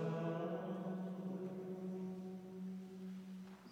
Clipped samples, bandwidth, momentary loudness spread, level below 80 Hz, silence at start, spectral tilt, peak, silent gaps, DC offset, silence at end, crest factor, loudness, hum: under 0.1%; 16 kHz; 9 LU; -86 dBFS; 0 s; -8.5 dB/octave; -30 dBFS; none; under 0.1%; 0 s; 16 dB; -46 LUFS; none